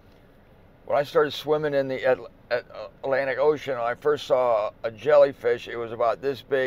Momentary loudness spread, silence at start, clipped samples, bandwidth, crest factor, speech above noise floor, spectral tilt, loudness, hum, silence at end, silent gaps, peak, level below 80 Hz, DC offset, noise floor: 10 LU; 0.85 s; under 0.1%; 15 kHz; 16 dB; 29 dB; -5.5 dB/octave; -24 LUFS; none; 0 s; none; -8 dBFS; -58 dBFS; under 0.1%; -53 dBFS